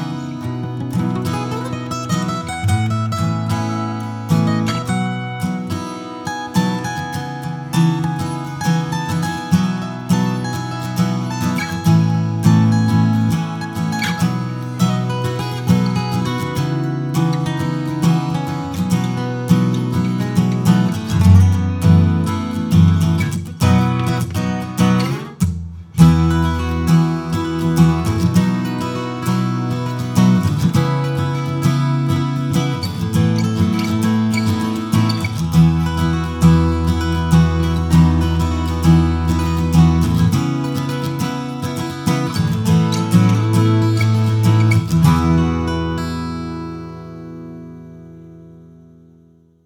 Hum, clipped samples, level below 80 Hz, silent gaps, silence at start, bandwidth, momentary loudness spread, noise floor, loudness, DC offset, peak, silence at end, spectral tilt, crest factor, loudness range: none; under 0.1%; -32 dBFS; none; 0 s; 17.5 kHz; 10 LU; -50 dBFS; -17 LUFS; under 0.1%; 0 dBFS; 1 s; -7 dB/octave; 16 dB; 6 LU